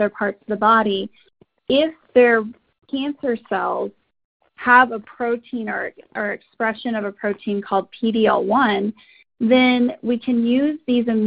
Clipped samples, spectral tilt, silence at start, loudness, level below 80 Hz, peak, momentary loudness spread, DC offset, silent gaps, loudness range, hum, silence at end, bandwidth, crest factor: under 0.1%; -9.5 dB/octave; 0 s; -20 LUFS; -60 dBFS; 0 dBFS; 12 LU; under 0.1%; 4.25-4.40 s; 3 LU; none; 0 s; 5 kHz; 20 dB